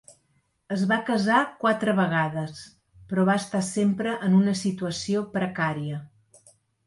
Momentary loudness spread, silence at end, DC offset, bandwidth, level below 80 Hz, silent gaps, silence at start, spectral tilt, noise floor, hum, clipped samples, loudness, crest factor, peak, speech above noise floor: 11 LU; 0.8 s; under 0.1%; 11.5 kHz; -64 dBFS; none; 0.1 s; -6 dB/octave; -69 dBFS; none; under 0.1%; -25 LUFS; 18 dB; -8 dBFS; 45 dB